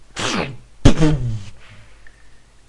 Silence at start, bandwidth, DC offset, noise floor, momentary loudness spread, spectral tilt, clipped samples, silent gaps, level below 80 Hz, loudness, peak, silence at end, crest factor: 0.15 s; 11 kHz; under 0.1%; -44 dBFS; 16 LU; -5.5 dB/octave; under 0.1%; none; -26 dBFS; -19 LUFS; 0 dBFS; 0.3 s; 18 dB